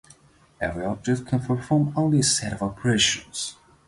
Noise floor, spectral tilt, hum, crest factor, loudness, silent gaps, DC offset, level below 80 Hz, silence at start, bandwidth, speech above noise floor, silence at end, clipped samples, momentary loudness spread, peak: -55 dBFS; -4 dB/octave; none; 18 dB; -24 LUFS; none; under 0.1%; -50 dBFS; 0.6 s; 11.5 kHz; 31 dB; 0.35 s; under 0.1%; 11 LU; -8 dBFS